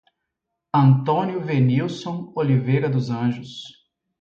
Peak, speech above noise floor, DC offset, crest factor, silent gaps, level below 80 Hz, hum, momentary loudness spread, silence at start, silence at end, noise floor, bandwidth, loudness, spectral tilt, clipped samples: -4 dBFS; 60 dB; under 0.1%; 16 dB; none; -62 dBFS; none; 15 LU; 0.75 s; 0.5 s; -80 dBFS; 7.4 kHz; -21 LUFS; -8.5 dB/octave; under 0.1%